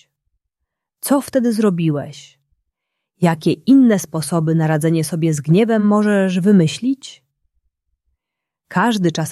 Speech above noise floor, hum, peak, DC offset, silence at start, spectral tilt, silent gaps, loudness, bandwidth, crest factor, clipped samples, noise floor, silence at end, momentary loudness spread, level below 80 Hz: 67 dB; none; -2 dBFS; under 0.1%; 1.05 s; -6.5 dB/octave; none; -16 LUFS; 14 kHz; 16 dB; under 0.1%; -82 dBFS; 0 s; 9 LU; -62 dBFS